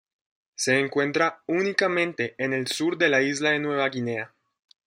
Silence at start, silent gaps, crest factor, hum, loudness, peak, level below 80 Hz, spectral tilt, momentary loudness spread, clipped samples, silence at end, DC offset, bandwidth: 0.6 s; none; 18 dB; none; -24 LUFS; -6 dBFS; -72 dBFS; -4 dB/octave; 8 LU; under 0.1%; 0.6 s; under 0.1%; 16 kHz